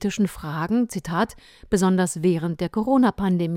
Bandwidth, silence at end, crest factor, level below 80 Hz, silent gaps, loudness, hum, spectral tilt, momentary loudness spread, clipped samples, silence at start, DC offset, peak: 15.5 kHz; 0 s; 14 dB; -48 dBFS; none; -23 LUFS; none; -6 dB/octave; 6 LU; under 0.1%; 0 s; under 0.1%; -8 dBFS